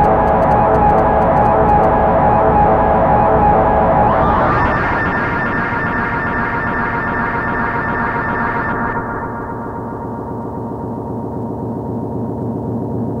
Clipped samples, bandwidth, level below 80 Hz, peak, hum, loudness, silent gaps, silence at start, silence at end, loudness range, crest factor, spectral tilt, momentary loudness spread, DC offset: under 0.1%; 6.6 kHz; -28 dBFS; 0 dBFS; none; -15 LUFS; none; 0 s; 0 s; 11 LU; 14 dB; -9 dB/octave; 12 LU; under 0.1%